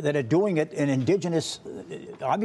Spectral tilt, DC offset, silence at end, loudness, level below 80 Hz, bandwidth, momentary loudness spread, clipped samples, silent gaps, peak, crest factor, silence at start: -6 dB/octave; under 0.1%; 0 s; -25 LUFS; -68 dBFS; 12 kHz; 15 LU; under 0.1%; none; -10 dBFS; 14 dB; 0 s